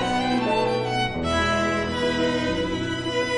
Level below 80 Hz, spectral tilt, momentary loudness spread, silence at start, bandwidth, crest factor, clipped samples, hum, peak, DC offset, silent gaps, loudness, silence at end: -42 dBFS; -5 dB/octave; 4 LU; 0 s; 11 kHz; 12 dB; under 0.1%; none; -10 dBFS; under 0.1%; none; -23 LUFS; 0 s